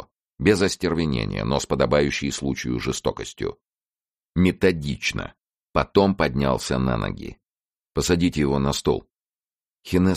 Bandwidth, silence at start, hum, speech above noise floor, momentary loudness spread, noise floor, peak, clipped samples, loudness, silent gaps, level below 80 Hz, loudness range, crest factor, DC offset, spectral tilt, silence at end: 15 kHz; 0 s; none; over 68 dB; 11 LU; under -90 dBFS; -4 dBFS; under 0.1%; -23 LUFS; 0.32-0.38 s, 3.85-3.91 s, 4.17-4.21 s, 5.60-5.67 s, 7.50-7.54 s, 9.21-9.25 s, 9.56-9.60 s, 9.74-9.78 s; -40 dBFS; 3 LU; 20 dB; under 0.1%; -5.5 dB/octave; 0 s